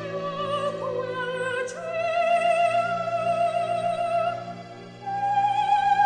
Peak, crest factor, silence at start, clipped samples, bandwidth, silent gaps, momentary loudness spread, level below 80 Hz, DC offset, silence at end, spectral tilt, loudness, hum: -10 dBFS; 14 dB; 0 s; under 0.1%; 10 kHz; none; 10 LU; -66 dBFS; under 0.1%; 0 s; -4.5 dB/octave; -25 LUFS; none